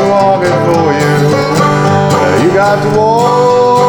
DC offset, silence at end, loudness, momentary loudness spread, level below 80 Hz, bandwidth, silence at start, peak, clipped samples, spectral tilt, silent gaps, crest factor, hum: under 0.1%; 0 s; -9 LUFS; 2 LU; -44 dBFS; 19.5 kHz; 0 s; 0 dBFS; under 0.1%; -6 dB/octave; none; 8 dB; none